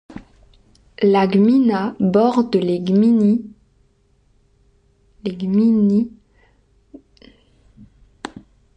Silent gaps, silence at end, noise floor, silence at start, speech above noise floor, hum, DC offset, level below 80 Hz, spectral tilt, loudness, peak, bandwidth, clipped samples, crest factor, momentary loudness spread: none; 0.45 s; -58 dBFS; 0.1 s; 43 dB; 50 Hz at -40 dBFS; under 0.1%; -56 dBFS; -8.5 dB/octave; -17 LUFS; -4 dBFS; 8.4 kHz; under 0.1%; 16 dB; 20 LU